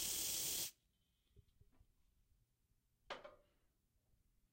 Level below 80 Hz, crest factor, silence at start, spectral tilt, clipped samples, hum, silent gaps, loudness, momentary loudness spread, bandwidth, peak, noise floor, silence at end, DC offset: -74 dBFS; 22 dB; 0 s; 0.5 dB/octave; under 0.1%; none; none; -41 LUFS; 15 LU; 16 kHz; -30 dBFS; -82 dBFS; 1.15 s; under 0.1%